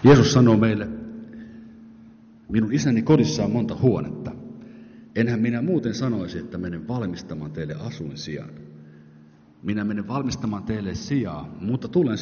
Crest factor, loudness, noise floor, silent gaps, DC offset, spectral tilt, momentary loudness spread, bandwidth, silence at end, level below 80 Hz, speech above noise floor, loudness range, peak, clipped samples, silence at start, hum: 18 dB; -23 LUFS; -50 dBFS; none; under 0.1%; -7 dB/octave; 20 LU; 6.8 kHz; 0 s; -50 dBFS; 29 dB; 9 LU; -6 dBFS; under 0.1%; 0 s; none